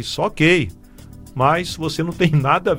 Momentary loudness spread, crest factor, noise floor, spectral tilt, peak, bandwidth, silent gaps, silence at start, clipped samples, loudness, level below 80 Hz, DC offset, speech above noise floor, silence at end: 9 LU; 18 dB; -40 dBFS; -5.5 dB/octave; -2 dBFS; 16.5 kHz; none; 0 s; under 0.1%; -18 LUFS; -42 dBFS; under 0.1%; 22 dB; 0 s